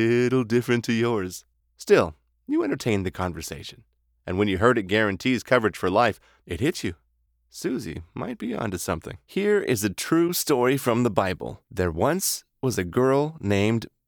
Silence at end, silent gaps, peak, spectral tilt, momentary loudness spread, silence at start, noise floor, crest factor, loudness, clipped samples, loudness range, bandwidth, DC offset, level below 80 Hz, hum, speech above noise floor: 0.2 s; none; -4 dBFS; -5 dB/octave; 13 LU; 0 s; -68 dBFS; 22 dB; -24 LUFS; under 0.1%; 4 LU; over 20 kHz; under 0.1%; -54 dBFS; none; 44 dB